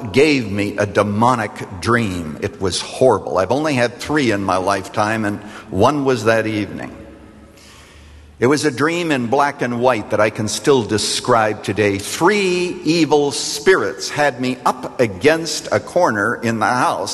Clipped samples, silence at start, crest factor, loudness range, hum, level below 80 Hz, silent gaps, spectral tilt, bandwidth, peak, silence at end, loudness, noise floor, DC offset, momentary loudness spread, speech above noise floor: under 0.1%; 0 s; 16 dB; 4 LU; none; -50 dBFS; none; -4.5 dB/octave; 13 kHz; 0 dBFS; 0 s; -17 LUFS; -43 dBFS; under 0.1%; 6 LU; 26 dB